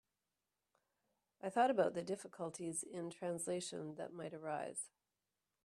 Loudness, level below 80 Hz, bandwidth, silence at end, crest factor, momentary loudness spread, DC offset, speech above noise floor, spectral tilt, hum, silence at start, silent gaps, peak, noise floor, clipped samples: -42 LUFS; -86 dBFS; 14 kHz; 0.75 s; 22 dB; 13 LU; under 0.1%; over 49 dB; -4 dB/octave; none; 1.45 s; none; -22 dBFS; under -90 dBFS; under 0.1%